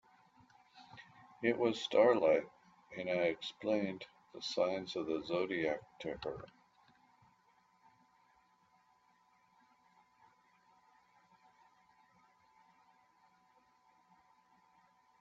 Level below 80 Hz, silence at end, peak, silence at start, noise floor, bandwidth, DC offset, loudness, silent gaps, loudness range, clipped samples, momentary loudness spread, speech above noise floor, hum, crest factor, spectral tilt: -76 dBFS; 8.75 s; -16 dBFS; 0.75 s; -72 dBFS; 7.6 kHz; under 0.1%; -36 LUFS; none; 14 LU; under 0.1%; 26 LU; 37 dB; none; 24 dB; -3 dB/octave